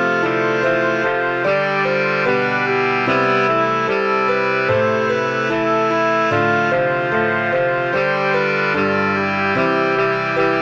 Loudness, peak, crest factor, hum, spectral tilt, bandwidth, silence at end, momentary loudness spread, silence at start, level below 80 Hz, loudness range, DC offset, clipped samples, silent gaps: -17 LUFS; -4 dBFS; 14 dB; none; -6 dB/octave; 8 kHz; 0 s; 2 LU; 0 s; -58 dBFS; 1 LU; under 0.1%; under 0.1%; none